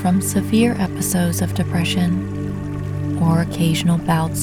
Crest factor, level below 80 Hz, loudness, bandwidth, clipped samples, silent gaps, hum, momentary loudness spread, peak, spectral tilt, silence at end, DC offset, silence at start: 16 dB; -40 dBFS; -19 LUFS; 18.5 kHz; under 0.1%; none; 50 Hz at -45 dBFS; 8 LU; -2 dBFS; -5.5 dB/octave; 0 s; under 0.1%; 0 s